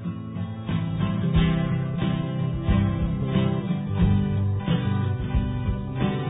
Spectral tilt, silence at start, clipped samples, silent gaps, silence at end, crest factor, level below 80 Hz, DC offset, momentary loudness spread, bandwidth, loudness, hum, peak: -12 dB/octave; 0 s; under 0.1%; none; 0 s; 12 dB; -32 dBFS; under 0.1%; 6 LU; 4 kHz; -25 LUFS; none; -10 dBFS